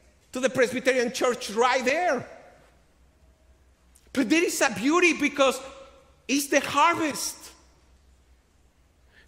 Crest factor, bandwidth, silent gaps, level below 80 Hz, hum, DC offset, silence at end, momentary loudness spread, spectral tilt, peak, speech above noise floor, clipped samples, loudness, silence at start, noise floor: 20 dB; 16 kHz; none; -60 dBFS; none; under 0.1%; 1.8 s; 13 LU; -2.5 dB/octave; -6 dBFS; 37 dB; under 0.1%; -24 LUFS; 0.35 s; -61 dBFS